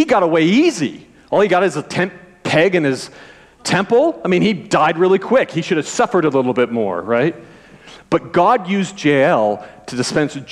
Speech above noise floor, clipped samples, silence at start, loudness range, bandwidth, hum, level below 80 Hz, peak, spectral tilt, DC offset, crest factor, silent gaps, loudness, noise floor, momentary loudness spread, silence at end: 26 dB; under 0.1%; 0 s; 2 LU; 12 kHz; none; -56 dBFS; -4 dBFS; -5.5 dB/octave; under 0.1%; 12 dB; none; -16 LUFS; -41 dBFS; 9 LU; 0 s